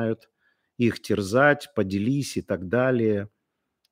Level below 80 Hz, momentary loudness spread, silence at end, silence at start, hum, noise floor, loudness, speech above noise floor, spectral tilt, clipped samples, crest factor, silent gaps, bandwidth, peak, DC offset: -62 dBFS; 10 LU; 0.65 s; 0 s; none; -79 dBFS; -24 LUFS; 56 dB; -6 dB/octave; under 0.1%; 20 dB; none; 16 kHz; -4 dBFS; under 0.1%